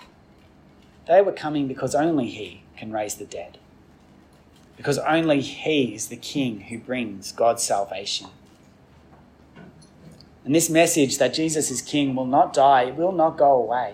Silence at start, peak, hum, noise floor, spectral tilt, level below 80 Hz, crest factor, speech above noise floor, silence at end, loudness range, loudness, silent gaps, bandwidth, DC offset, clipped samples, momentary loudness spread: 1.1 s; -6 dBFS; none; -52 dBFS; -4 dB/octave; -62 dBFS; 18 dB; 31 dB; 0 s; 8 LU; -22 LUFS; none; 16 kHz; under 0.1%; under 0.1%; 14 LU